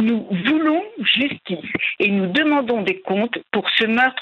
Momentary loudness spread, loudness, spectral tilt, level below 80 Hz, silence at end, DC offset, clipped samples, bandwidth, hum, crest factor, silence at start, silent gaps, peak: 5 LU; -19 LUFS; -7 dB/octave; -64 dBFS; 0 s; under 0.1%; under 0.1%; 6.2 kHz; none; 18 dB; 0 s; none; -2 dBFS